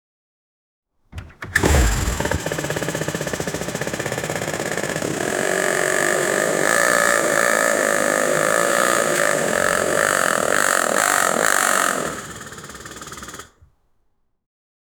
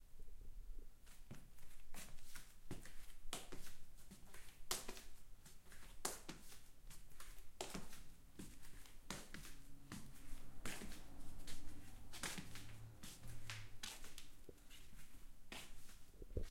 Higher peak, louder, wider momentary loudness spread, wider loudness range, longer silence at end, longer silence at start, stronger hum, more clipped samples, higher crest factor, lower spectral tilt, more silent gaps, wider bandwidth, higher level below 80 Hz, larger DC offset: first, 0 dBFS vs -24 dBFS; first, -19 LUFS vs -55 LUFS; about the same, 17 LU vs 15 LU; about the same, 6 LU vs 5 LU; first, 1.55 s vs 0 s; first, 1.15 s vs 0 s; neither; neither; about the same, 20 dB vs 24 dB; about the same, -3 dB/octave vs -2.5 dB/octave; neither; first, over 20 kHz vs 16.5 kHz; first, -34 dBFS vs -58 dBFS; neither